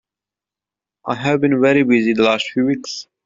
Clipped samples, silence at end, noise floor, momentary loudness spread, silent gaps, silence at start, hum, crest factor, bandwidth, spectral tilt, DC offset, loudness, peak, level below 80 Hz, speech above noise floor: under 0.1%; 0.25 s; -88 dBFS; 12 LU; none; 1.05 s; none; 16 dB; 7.6 kHz; -5.5 dB/octave; under 0.1%; -16 LUFS; -2 dBFS; -60 dBFS; 72 dB